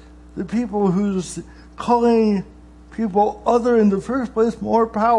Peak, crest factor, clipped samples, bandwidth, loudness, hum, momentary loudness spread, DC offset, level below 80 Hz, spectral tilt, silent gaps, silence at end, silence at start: -4 dBFS; 14 dB; under 0.1%; 11 kHz; -19 LUFS; none; 15 LU; under 0.1%; -44 dBFS; -7 dB/octave; none; 0 s; 0.35 s